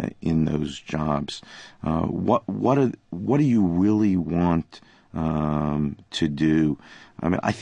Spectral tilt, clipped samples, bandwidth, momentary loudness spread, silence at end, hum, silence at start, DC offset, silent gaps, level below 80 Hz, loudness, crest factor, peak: -7.5 dB/octave; under 0.1%; 9.8 kHz; 11 LU; 0 s; none; 0 s; under 0.1%; none; -42 dBFS; -24 LUFS; 18 dB; -6 dBFS